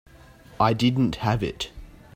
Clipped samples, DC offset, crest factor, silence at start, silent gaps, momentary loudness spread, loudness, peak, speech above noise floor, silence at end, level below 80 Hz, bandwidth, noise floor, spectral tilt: under 0.1%; under 0.1%; 20 dB; 0.5 s; none; 12 LU; -24 LUFS; -4 dBFS; 26 dB; 0.3 s; -46 dBFS; 16 kHz; -49 dBFS; -6.5 dB/octave